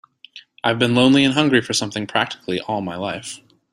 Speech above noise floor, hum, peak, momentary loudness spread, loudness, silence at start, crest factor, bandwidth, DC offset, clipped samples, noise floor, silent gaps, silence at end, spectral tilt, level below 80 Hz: 26 dB; none; -2 dBFS; 13 LU; -19 LUFS; 0.35 s; 18 dB; 12.5 kHz; under 0.1%; under 0.1%; -45 dBFS; none; 0.35 s; -4.5 dB/octave; -58 dBFS